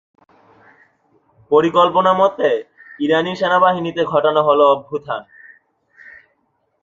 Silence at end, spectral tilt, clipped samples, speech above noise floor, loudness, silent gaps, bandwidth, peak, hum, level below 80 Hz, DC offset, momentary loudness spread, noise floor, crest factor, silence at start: 1.6 s; -6 dB/octave; under 0.1%; 51 dB; -16 LUFS; none; 7.6 kHz; -2 dBFS; none; -62 dBFS; under 0.1%; 11 LU; -66 dBFS; 16 dB; 1.5 s